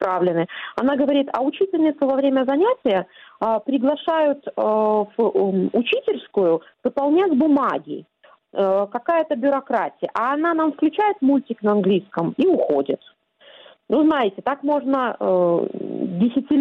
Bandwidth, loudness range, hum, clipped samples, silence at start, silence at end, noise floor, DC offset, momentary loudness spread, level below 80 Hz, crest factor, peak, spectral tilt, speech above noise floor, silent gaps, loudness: 5.4 kHz; 1 LU; none; under 0.1%; 0 s; 0 s; -50 dBFS; under 0.1%; 6 LU; -66 dBFS; 12 dB; -8 dBFS; -8.5 dB/octave; 30 dB; none; -20 LUFS